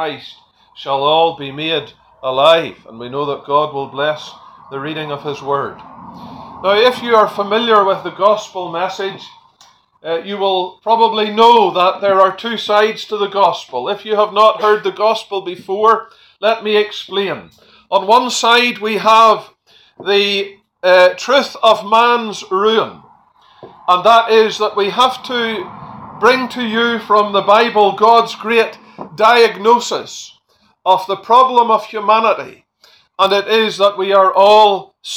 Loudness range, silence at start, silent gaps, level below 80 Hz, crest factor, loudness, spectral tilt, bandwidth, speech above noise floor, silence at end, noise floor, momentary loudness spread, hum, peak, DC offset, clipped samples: 5 LU; 0 s; none; -62 dBFS; 14 dB; -13 LUFS; -3.5 dB/octave; 19 kHz; 43 dB; 0 s; -56 dBFS; 14 LU; none; 0 dBFS; under 0.1%; under 0.1%